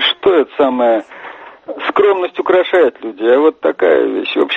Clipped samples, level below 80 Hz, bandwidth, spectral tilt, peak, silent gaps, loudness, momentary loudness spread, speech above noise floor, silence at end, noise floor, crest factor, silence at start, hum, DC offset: under 0.1%; -58 dBFS; 5.6 kHz; -5.5 dB/octave; 0 dBFS; none; -13 LUFS; 17 LU; 21 dB; 0 s; -33 dBFS; 12 dB; 0 s; none; under 0.1%